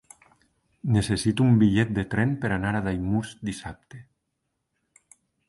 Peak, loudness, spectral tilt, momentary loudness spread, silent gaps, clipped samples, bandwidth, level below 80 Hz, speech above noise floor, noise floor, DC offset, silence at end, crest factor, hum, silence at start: -8 dBFS; -24 LUFS; -6.5 dB/octave; 15 LU; none; under 0.1%; 11.5 kHz; -48 dBFS; 55 dB; -79 dBFS; under 0.1%; 1.45 s; 18 dB; none; 0.85 s